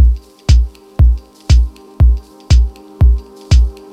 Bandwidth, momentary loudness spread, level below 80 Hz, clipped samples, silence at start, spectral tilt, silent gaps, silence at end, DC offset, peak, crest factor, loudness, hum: 8.6 kHz; 8 LU; -12 dBFS; under 0.1%; 0 s; -6 dB/octave; none; 0.2 s; under 0.1%; 0 dBFS; 12 dB; -15 LUFS; none